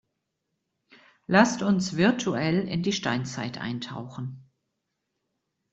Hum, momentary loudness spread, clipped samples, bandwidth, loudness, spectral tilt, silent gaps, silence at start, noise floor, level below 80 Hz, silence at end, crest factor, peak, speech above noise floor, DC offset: none; 16 LU; under 0.1%; 8.2 kHz; -26 LUFS; -5 dB/octave; none; 1.3 s; -81 dBFS; -64 dBFS; 1.3 s; 24 dB; -4 dBFS; 55 dB; under 0.1%